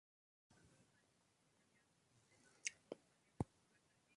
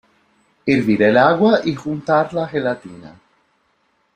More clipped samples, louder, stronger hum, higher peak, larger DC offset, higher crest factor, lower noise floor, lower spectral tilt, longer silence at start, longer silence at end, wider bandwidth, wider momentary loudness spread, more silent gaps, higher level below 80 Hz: neither; second, -52 LUFS vs -17 LUFS; neither; second, -24 dBFS vs -2 dBFS; neither; first, 34 dB vs 18 dB; first, -80 dBFS vs -64 dBFS; second, -3.5 dB/octave vs -7 dB/octave; first, 2.65 s vs 0.65 s; second, 0.75 s vs 1.05 s; first, 11 kHz vs 9.4 kHz; second, 10 LU vs 13 LU; neither; second, -74 dBFS vs -56 dBFS